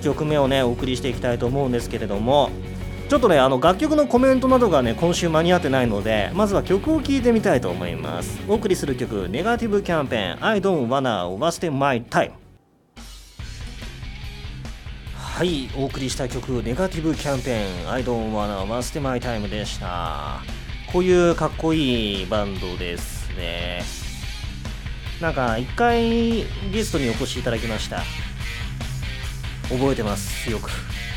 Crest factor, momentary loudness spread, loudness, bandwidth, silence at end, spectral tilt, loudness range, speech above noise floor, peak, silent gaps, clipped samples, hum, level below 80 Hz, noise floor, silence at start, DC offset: 20 dB; 14 LU; -22 LUFS; 18.5 kHz; 0 s; -5.5 dB/octave; 9 LU; 32 dB; -2 dBFS; none; under 0.1%; none; -34 dBFS; -54 dBFS; 0 s; under 0.1%